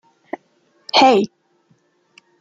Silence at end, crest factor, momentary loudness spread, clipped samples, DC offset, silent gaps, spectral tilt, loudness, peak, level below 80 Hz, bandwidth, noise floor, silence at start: 1.15 s; 18 dB; 22 LU; under 0.1%; under 0.1%; none; -3.5 dB/octave; -15 LUFS; -2 dBFS; -68 dBFS; 7.8 kHz; -60 dBFS; 0.95 s